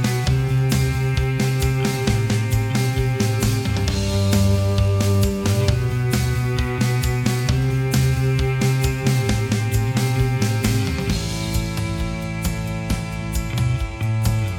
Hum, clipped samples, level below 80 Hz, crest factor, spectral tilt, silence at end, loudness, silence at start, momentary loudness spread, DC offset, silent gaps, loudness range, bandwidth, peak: none; under 0.1%; -30 dBFS; 18 dB; -5.5 dB/octave; 0 s; -21 LUFS; 0 s; 6 LU; under 0.1%; none; 4 LU; 17.5 kHz; -2 dBFS